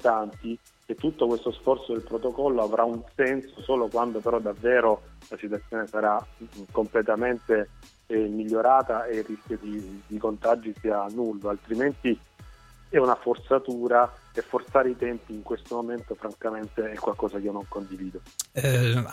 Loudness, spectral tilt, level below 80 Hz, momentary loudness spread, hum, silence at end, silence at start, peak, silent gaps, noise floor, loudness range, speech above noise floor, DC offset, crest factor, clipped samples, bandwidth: -27 LUFS; -6 dB/octave; -52 dBFS; 13 LU; none; 0 s; 0 s; -8 dBFS; none; -50 dBFS; 4 LU; 23 dB; under 0.1%; 20 dB; under 0.1%; 16 kHz